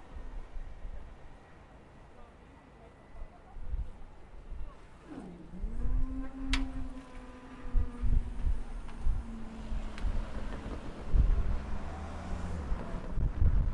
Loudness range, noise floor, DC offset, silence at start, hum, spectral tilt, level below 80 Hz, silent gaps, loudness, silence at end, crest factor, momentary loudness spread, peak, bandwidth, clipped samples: 13 LU; -55 dBFS; under 0.1%; 0 s; none; -6.5 dB/octave; -34 dBFS; none; -39 LUFS; 0 s; 20 dB; 21 LU; -14 dBFS; 10.5 kHz; under 0.1%